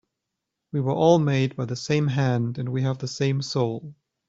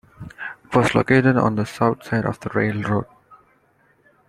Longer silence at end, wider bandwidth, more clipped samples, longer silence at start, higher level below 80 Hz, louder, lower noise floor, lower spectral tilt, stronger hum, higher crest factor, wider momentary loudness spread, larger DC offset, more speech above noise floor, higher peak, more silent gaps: second, 0.35 s vs 0.95 s; second, 7.8 kHz vs 13 kHz; neither; first, 0.75 s vs 0.2 s; second, -62 dBFS vs -52 dBFS; second, -24 LUFS vs -20 LUFS; first, -83 dBFS vs -60 dBFS; about the same, -6.5 dB/octave vs -7 dB/octave; neither; about the same, 20 dB vs 20 dB; second, 9 LU vs 18 LU; neither; first, 60 dB vs 41 dB; about the same, -4 dBFS vs -2 dBFS; neither